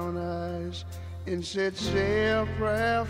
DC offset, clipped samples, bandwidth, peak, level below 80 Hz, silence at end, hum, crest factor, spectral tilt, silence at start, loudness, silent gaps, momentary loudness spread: under 0.1%; under 0.1%; 15.5 kHz; -16 dBFS; -44 dBFS; 0 s; none; 14 dB; -5.5 dB/octave; 0 s; -29 LUFS; none; 12 LU